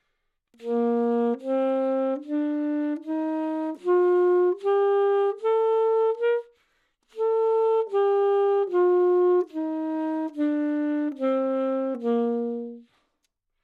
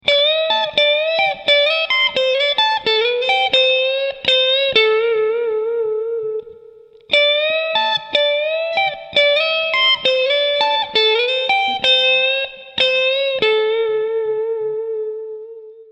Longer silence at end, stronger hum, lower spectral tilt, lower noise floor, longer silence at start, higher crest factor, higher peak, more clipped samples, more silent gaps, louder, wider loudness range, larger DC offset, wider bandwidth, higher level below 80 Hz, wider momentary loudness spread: first, 0.8 s vs 0.1 s; neither; first, -7 dB/octave vs -1.5 dB/octave; first, -76 dBFS vs -43 dBFS; first, 0.6 s vs 0.05 s; second, 10 dB vs 16 dB; second, -14 dBFS vs 0 dBFS; neither; neither; second, -24 LUFS vs -15 LUFS; about the same, 4 LU vs 3 LU; neither; second, 4.6 kHz vs 8.8 kHz; second, -80 dBFS vs -60 dBFS; about the same, 8 LU vs 9 LU